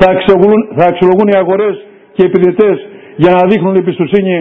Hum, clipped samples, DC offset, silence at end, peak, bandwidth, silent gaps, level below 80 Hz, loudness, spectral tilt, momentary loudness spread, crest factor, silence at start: none; 1%; under 0.1%; 0 s; 0 dBFS; 4.8 kHz; none; -42 dBFS; -9 LUFS; -9 dB/octave; 9 LU; 8 dB; 0 s